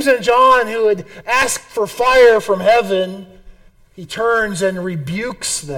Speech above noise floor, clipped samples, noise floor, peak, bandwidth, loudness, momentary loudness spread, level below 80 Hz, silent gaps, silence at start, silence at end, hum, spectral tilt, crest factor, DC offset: 27 dB; under 0.1%; -42 dBFS; -2 dBFS; 18 kHz; -15 LUFS; 12 LU; -44 dBFS; none; 0 s; 0 s; none; -3.5 dB/octave; 14 dB; under 0.1%